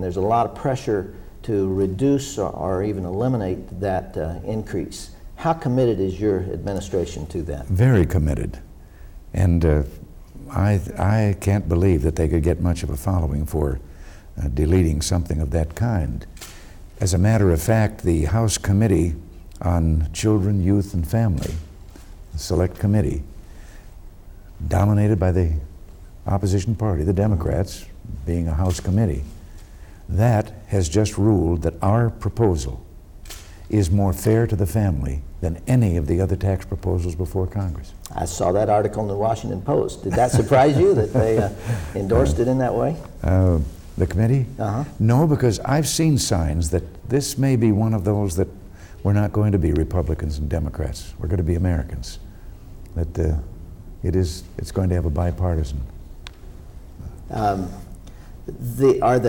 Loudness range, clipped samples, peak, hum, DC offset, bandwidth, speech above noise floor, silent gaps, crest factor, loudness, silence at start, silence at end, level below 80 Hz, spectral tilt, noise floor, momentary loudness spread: 6 LU; under 0.1%; -6 dBFS; none; under 0.1%; 18 kHz; 21 dB; none; 16 dB; -21 LUFS; 0 s; 0 s; -32 dBFS; -7 dB/octave; -41 dBFS; 14 LU